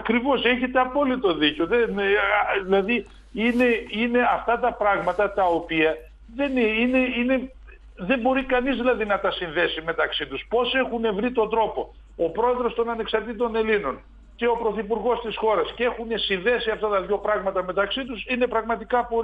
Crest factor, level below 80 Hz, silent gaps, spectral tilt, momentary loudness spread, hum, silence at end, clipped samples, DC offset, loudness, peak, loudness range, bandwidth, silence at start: 18 dB; -46 dBFS; none; -6.5 dB/octave; 6 LU; none; 0 s; under 0.1%; under 0.1%; -23 LUFS; -6 dBFS; 3 LU; 7.4 kHz; 0 s